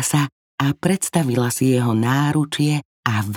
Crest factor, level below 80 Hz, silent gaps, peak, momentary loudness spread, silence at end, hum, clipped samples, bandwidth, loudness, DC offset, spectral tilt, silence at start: 16 dB; -58 dBFS; 0.32-0.58 s, 2.85-3.03 s; -2 dBFS; 5 LU; 0 s; none; under 0.1%; 17.5 kHz; -20 LUFS; under 0.1%; -5 dB/octave; 0 s